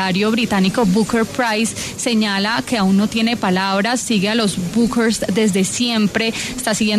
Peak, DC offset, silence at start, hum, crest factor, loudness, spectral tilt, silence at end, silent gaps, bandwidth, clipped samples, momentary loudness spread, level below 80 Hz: -4 dBFS; under 0.1%; 0 s; none; 12 dB; -17 LUFS; -4 dB/octave; 0 s; none; 13.5 kHz; under 0.1%; 3 LU; -46 dBFS